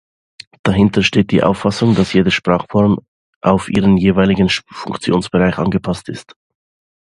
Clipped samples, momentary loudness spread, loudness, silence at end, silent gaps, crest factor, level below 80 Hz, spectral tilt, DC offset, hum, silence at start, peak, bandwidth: under 0.1%; 9 LU; -15 LUFS; 0.8 s; 3.08-3.41 s; 16 dB; -38 dBFS; -6.5 dB/octave; under 0.1%; none; 0.65 s; 0 dBFS; 11 kHz